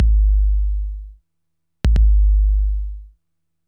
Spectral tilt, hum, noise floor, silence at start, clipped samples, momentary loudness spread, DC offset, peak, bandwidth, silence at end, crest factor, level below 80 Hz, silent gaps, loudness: -8 dB/octave; none; -79 dBFS; 0 s; under 0.1%; 16 LU; under 0.1%; -4 dBFS; 3.3 kHz; 0.6 s; 12 dB; -16 dBFS; none; -19 LUFS